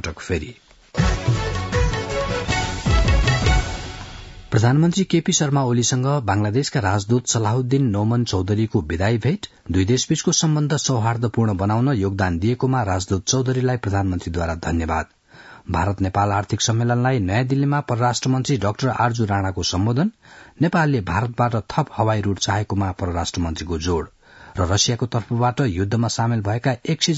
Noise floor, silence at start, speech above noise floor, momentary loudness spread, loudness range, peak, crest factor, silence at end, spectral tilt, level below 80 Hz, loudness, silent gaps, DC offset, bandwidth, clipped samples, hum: -45 dBFS; 0.05 s; 25 dB; 7 LU; 3 LU; -4 dBFS; 16 dB; 0 s; -5 dB/octave; -32 dBFS; -21 LUFS; none; under 0.1%; 8 kHz; under 0.1%; none